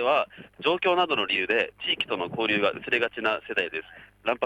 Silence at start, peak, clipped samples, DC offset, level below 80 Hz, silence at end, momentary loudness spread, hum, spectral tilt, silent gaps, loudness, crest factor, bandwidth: 0 s; -10 dBFS; under 0.1%; under 0.1%; -66 dBFS; 0 s; 7 LU; none; -5 dB/octave; none; -26 LUFS; 16 dB; 11.5 kHz